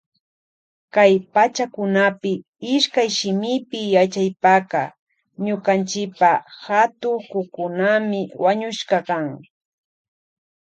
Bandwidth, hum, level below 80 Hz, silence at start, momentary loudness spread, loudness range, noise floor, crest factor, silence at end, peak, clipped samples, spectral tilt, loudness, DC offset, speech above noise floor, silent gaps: 9 kHz; none; -72 dBFS; 0.95 s; 10 LU; 4 LU; under -90 dBFS; 20 dB; 1.3 s; -2 dBFS; under 0.1%; -4.5 dB/octave; -20 LUFS; under 0.1%; over 71 dB; 2.48-2.53 s, 4.99-5.07 s